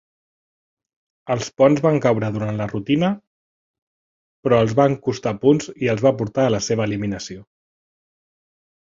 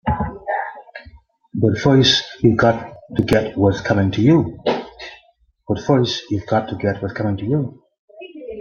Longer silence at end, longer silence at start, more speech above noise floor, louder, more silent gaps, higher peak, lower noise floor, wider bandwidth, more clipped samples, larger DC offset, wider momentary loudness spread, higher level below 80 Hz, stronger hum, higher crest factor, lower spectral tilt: first, 1.6 s vs 0 s; first, 1.25 s vs 0.05 s; first, over 71 dB vs 39 dB; about the same, -20 LUFS vs -18 LUFS; first, 3.27-3.74 s, 3.82-4.43 s vs 7.99-8.08 s; about the same, 0 dBFS vs -2 dBFS; first, under -90 dBFS vs -56 dBFS; second, 7.8 kHz vs 14 kHz; neither; neither; second, 11 LU vs 19 LU; second, -54 dBFS vs -44 dBFS; neither; about the same, 20 dB vs 18 dB; about the same, -6.5 dB/octave vs -6 dB/octave